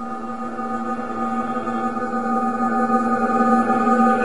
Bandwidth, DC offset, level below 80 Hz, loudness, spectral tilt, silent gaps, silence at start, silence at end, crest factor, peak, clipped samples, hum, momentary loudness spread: 10.5 kHz; 1%; -54 dBFS; -21 LUFS; -6.5 dB/octave; none; 0 s; 0 s; 18 dB; -2 dBFS; under 0.1%; none; 10 LU